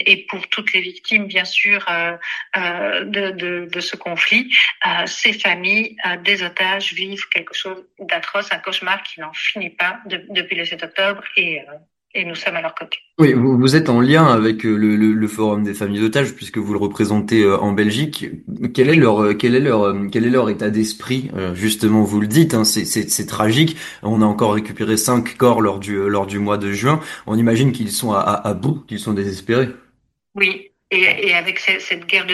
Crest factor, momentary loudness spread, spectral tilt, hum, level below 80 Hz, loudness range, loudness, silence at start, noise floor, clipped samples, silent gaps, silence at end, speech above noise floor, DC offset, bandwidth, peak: 18 dB; 10 LU; -4.5 dB/octave; none; -56 dBFS; 5 LU; -17 LUFS; 0 s; -62 dBFS; under 0.1%; none; 0 s; 45 dB; under 0.1%; 12.5 kHz; 0 dBFS